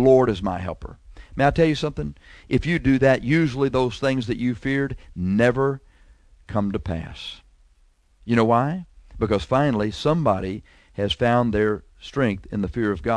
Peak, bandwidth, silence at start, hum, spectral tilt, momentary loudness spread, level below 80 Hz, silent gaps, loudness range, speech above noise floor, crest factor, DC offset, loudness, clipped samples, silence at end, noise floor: -4 dBFS; 11 kHz; 0 s; none; -7 dB/octave; 15 LU; -40 dBFS; none; 5 LU; 37 dB; 18 dB; under 0.1%; -22 LUFS; under 0.1%; 0 s; -58 dBFS